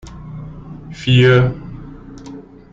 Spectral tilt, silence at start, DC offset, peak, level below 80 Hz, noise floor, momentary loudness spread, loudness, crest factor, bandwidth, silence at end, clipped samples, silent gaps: -7 dB/octave; 0.05 s; under 0.1%; -2 dBFS; -40 dBFS; -36 dBFS; 25 LU; -13 LUFS; 16 dB; 7.4 kHz; 0.3 s; under 0.1%; none